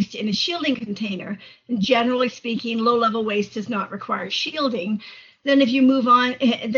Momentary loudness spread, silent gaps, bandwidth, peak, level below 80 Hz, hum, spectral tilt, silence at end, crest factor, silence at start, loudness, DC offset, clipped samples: 12 LU; none; 7.2 kHz; -4 dBFS; -64 dBFS; none; -3 dB/octave; 0 s; 16 dB; 0 s; -21 LUFS; under 0.1%; under 0.1%